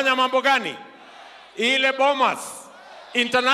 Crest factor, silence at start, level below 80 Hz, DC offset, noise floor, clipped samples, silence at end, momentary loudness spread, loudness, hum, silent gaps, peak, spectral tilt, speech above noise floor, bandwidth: 18 dB; 0 s; -74 dBFS; under 0.1%; -45 dBFS; under 0.1%; 0 s; 19 LU; -20 LUFS; none; none; -6 dBFS; -2 dB/octave; 24 dB; 14.5 kHz